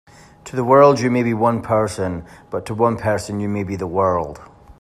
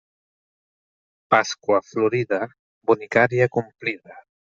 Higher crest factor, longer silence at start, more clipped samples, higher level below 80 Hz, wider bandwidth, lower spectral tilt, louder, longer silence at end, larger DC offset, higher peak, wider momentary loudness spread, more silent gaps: about the same, 18 dB vs 20 dB; second, 0.45 s vs 1.3 s; neither; first, -50 dBFS vs -66 dBFS; first, 13 kHz vs 7.6 kHz; first, -7 dB/octave vs -5.5 dB/octave; first, -18 LUFS vs -22 LUFS; second, 0.1 s vs 0.25 s; neither; about the same, 0 dBFS vs -2 dBFS; first, 17 LU vs 10 LU; second, none vs 2.59-2.81 s